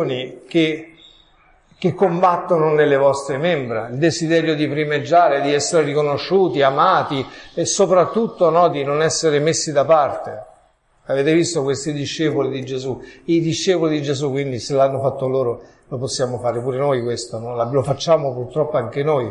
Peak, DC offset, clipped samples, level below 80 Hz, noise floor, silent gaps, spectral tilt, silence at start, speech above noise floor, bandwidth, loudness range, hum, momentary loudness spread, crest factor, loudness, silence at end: -2 dBFS; under 0.1%; under 0.1%; -56 dBFS; -57 dBFS; none; -5 dB/octave; 0 s; 39 dB; 11 kHz; 4 LU; none; 10 LU; 16 dB; -18 LUFS; 0 s